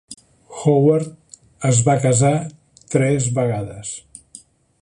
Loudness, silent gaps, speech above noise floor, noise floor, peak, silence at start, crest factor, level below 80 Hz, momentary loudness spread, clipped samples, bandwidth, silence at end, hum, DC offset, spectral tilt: -18 LUFS; none; 29 dB; -46 dBFS; -2 dBFS; 0.1 s; 18 dB; -52 dBFS; 19 LU; under 0.1%; 11 kHz; 0.8 s; none; under 0.1%; -6 dB/octave